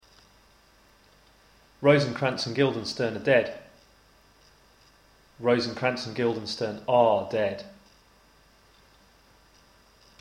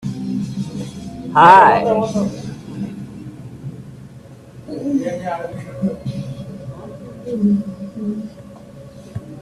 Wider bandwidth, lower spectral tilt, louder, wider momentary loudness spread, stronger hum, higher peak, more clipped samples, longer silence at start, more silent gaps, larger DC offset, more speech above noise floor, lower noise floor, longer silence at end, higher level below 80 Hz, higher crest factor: about the same, 11 kHz vs 12 kHz; about the same, -5.5 dB/octave vs -6.5 dB/octave; second, -26 LUFS vs -17 LUFS; second, 10 LU vs 24 LU; neither; second, -6 dBFS vs 0 dBFS; neither; first, 1.8 s vs 0 s; neither; neither; first, 34 dB vs 26 dB; first, -59 dBFS vs -39 dBFS; first, 2.5 s vs 0 s; second, -64 dBFS vs -50 dBFS; about the same, 22 dB vs 20 dB